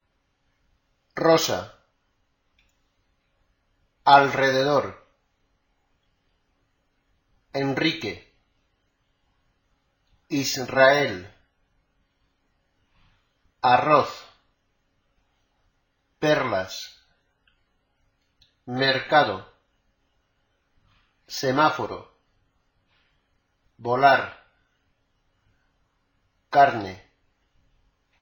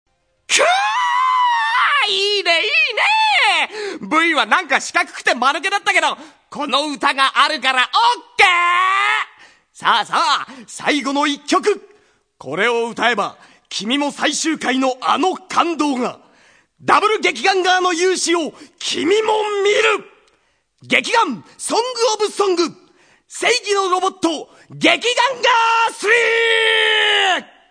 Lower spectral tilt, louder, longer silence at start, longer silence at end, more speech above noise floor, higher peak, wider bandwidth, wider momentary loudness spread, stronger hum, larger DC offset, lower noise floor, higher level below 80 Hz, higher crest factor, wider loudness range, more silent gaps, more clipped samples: first, -4 dB/octave vs -1.5 dB/octave; second, -22 LUFS vs -16 LUFS; first, 1.15 s vs 0.5 s; first, 1.25 s vs 0.3 s; first, 50 dB vs 45 dB; about the same, -2 dBFS vs 0 dBFS; first, 17 kHz vs 11 kHz; first, 19 LU vs 9 LU; neither; neither; first, -71 dBFS vs -62 dBFS; about the same, -64 dBFS vs -68 dBFS; first, 24 dB vs 18 dB; first, 8 LU vs 5 LU; neither; neither